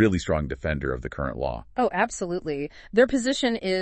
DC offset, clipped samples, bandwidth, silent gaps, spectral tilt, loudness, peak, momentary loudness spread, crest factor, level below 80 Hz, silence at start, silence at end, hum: under 0.1%; under 0.1%; 8.8 kHz; none; -5 dB/octave; -26 LUFS; -8 dBFS; 9 LU; 18 dB; -42 dBFS; 0 s; 0 s; none